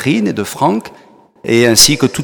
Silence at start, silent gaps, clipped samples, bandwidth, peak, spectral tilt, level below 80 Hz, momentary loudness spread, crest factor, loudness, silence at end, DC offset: 0 s; none; 0.3%; over 20 kHz; 0 dBFS; -3 dB/octave; -40 dBFS; 13 LU; 14 dB; -11 LUFS; 0 s; under 0.1%